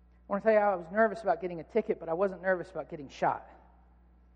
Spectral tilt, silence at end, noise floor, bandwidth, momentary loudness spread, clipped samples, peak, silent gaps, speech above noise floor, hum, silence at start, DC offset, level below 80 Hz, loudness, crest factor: -7 dB/octave; 0.9 s; -60 dBFS; 9 kHz; 12 LU; under 0.1%; -12 dBFS; none; 30 dB; 60 Hz at -60 dBFS; 0.3 s; under 0.1%; -60 dBFS; -31 LUFS; 18 dB